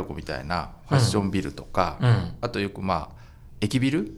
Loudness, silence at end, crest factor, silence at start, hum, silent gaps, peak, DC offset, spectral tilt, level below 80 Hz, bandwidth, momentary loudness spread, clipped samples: -26 LUFS; 0 s; 20 dB; 0 s; none; none; -6 dBFS; under 0.1%; -6 dB/octave; -44 dBFS; 12.5 kHz; 9 LU; under 0.1%